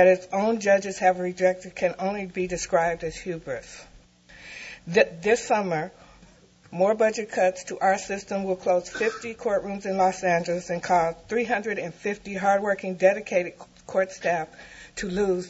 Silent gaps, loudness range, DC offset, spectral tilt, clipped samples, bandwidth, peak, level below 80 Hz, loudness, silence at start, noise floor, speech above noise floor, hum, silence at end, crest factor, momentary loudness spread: none; 3 LU; under 0.1%; -4.5 dB/octave; under 0.1%; 8 kHz; -4 dBFS; -56 dBFS; -25 LUFS; 0 s; -54 dBFS; 29 dB; none; 0 s; 20 dB; 12 LU